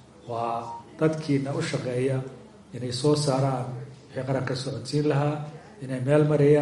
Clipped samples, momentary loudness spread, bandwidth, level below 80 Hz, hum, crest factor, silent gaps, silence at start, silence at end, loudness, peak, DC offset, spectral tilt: under 0.1%; 15 LU; 11.5 kHz; -62 dBFS; none; 18 dB; none; 0.25 s; 0 s; -26 LUFS; -6 dBFS; under 0.1%; -6.5 dB/octave